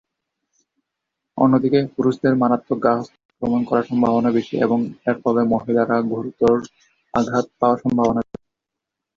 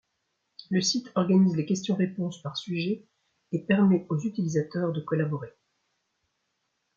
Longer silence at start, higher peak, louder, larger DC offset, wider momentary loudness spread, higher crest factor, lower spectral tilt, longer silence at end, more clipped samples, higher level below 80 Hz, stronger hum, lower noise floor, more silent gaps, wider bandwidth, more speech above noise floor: first, 1.35 s vs 0.6 s; first, -2 dBFS vs -10 dBFS; first, -19 LUFS vs -27 LUFS; neither; second, 7 LU vs 12 LU; about the same, 18 dB vs 18 dB; first, -8 dB/octave vs -6 dB/octave; second, 0.95 s vs 1.5 s; neither; first, -54 dBFS vs -70 dBFS; neither; first, -83 dBFS vs -78 dBFS; first, 3.25-3.29 s vs none; about the same, 7.4 kHz vs 7.2 kHz; first, 65 dB vs 52 dB